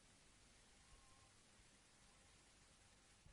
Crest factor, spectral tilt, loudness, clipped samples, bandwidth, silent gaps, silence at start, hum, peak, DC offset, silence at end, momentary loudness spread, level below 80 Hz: 16 dB; -2.5 dB/octave; -69 LUFS; under 0.1%; 11.5 kHz; none; 0 s; none; -54 dBFS; under 0.1%; 0 s; 1 LU; -78 dBFS